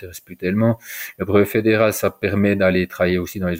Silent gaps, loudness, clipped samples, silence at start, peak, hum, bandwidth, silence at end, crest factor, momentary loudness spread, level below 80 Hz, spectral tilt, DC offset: none; -19 LUFS; under 0.1%; 0 s; -4 dBFS; none; 16.5 kHz; 0 s; 14 dB; 10 LU; -48 dBFS; -6 dB/octave; under 0.1%